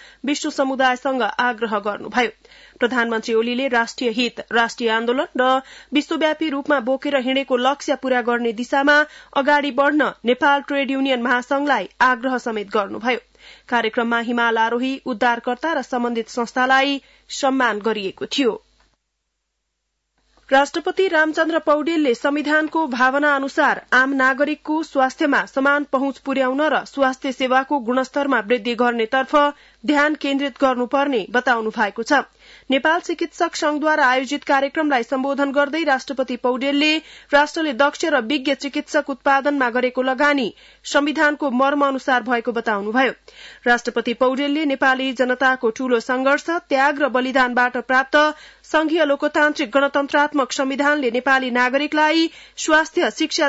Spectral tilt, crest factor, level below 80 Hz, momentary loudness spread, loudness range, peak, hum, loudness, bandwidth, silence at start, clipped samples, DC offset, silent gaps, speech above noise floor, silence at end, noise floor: -3 dB/octave; 16 dB; -60 dBFS; 6 LU; 3 LU; -4 dBFS; none; -19 LUFS; 8 kHz; 0.25 s; under 0.1%; under 0.1%; none; 56 dB; 0 s; -75 dBFS